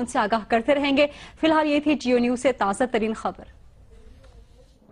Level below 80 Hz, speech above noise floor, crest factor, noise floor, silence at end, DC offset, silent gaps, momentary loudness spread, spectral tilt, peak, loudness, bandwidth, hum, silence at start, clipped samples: -50 dBFS; 29 dB; 16 dB; -52 dBFS; 0.5 s; under 0.1%; none; 5 LU; -4.5 dB/octave; -6 dBFS; -22 LUFS; 11 kHz; none; 0 s; under 0.1%